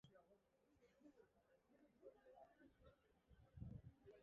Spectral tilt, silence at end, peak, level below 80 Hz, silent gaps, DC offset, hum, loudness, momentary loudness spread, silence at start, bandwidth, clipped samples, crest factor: -7.5 dB/octave; 0 s; -42 dBFS; -76 dBFS; none; under 0.1%; none; -64 LUFS; 10 LU; 0.05 s; 6.4 kHz; under 0.1%; 24 dB